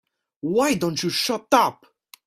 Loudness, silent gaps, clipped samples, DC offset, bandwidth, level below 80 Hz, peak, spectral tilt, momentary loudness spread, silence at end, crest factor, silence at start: -21 LUFS; none; under 0.1%; under 0.1%; 16 kHz; -62 dBFS; -2 dBFS; -4 dB/octave; 6 LU; 0.55 s; 22 dB; 0.45 s